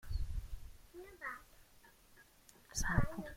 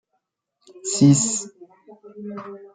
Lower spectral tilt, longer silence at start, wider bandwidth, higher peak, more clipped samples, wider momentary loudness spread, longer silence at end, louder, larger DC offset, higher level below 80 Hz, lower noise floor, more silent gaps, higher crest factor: about the same, -4.5 dB/octave vs -5 dB/octave; second, 0.05 s vs 0.85 s; first, 16.5 kHz vs 9.6 kHz; second, -16 dBFS vs -4 dBFS; neither; first, 27 LU vs 22 LU; about the same, 0 s vs 0.1 s; second, -42 LUFS vs -18 LUFS; neither; first, -46 dBFS vs -66 dBFS; second, -65 dBFS vs -76 dBFS; neither; about the same, 24 dB vs 20 dB